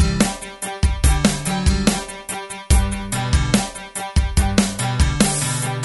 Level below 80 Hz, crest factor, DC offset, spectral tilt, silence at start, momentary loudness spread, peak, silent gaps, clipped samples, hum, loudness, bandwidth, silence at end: -22 dBFS; 18 dB; under 0.1%; -4.5 dB/octave; 0 s; 11 LU; -2 dBFS; none; under 0.1%; none; -20 LUFS; 12 kHz; 0 s